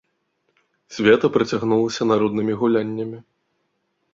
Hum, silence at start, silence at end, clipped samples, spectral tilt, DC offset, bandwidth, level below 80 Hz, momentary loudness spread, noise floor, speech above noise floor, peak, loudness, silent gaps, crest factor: none; 0.9 s; 0.9 s; under 0.1%; -6 dB/octave; under 0.1%; 7.6 kHz; -60 dBFS; 14 LU; -71 dBFS; 52 dB; -2 dBFS; -20 LUFS; none; 20 dB